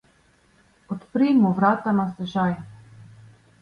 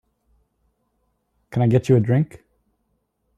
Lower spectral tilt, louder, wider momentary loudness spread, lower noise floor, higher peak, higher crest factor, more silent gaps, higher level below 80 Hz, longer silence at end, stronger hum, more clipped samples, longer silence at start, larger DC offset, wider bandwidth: about the same, -8.5 dB/octave vs -9 dB/octave; about the same, -22 LUFS vs -20 LUFS; first, 17 LU vs 12 LU; second, -60 dBFS vs -71 dBFS; about the same, -8 dBFS vs -6 dBFS; about the same, 16 dB vs 18 dB; neither; about the same, -60 dBFS vs -56 dBFS; second, 0.55 s vs 1.1 s; neither; neither; second, 0.9 s vs 1.5 s; neither; second, 6.6 kHz vs 9 kHz